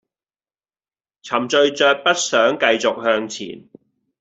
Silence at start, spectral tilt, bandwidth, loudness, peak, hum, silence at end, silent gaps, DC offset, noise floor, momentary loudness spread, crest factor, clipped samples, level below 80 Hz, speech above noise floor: 1.25 s; -2 dB/octave; 8.2 kHz; -17 LUFS; -2 dBFS; none; 0.6 s; none; under 0.1%; under -90 dBFS; 12 LU; 18 dB; under 0.1%; -66 dBFS; over 72 dB